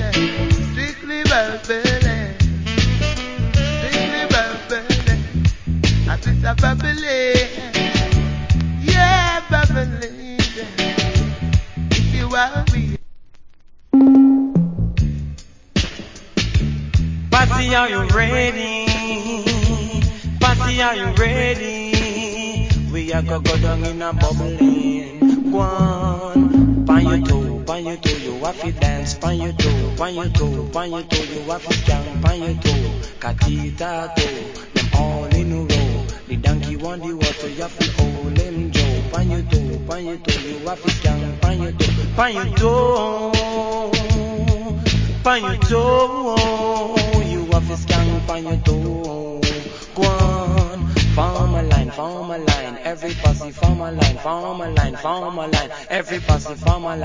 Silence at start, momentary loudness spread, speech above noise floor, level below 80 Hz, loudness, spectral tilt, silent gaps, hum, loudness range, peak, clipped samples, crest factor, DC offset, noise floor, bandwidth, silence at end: 0 s; 8 LU; 23 dB; -24 dBFS; -19 LUFS; -5.5 dB/octave; none; none; 4 LU; 0 dBFS; under 0.1%; 18 dB; under 0.1%; -41 dBFS; 7.6 kHz; 0 s